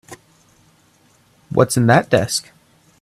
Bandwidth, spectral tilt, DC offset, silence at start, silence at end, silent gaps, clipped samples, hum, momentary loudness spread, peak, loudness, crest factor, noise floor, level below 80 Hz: 14.5 kHz; -5 dB/octave; under 0.1%; 0.1 s; 0.6 s; none; under 0.1%; none; 9 LU; 0 dBFS; -16 LUFS; 20 dB; -55 dBFS; -52 dBFS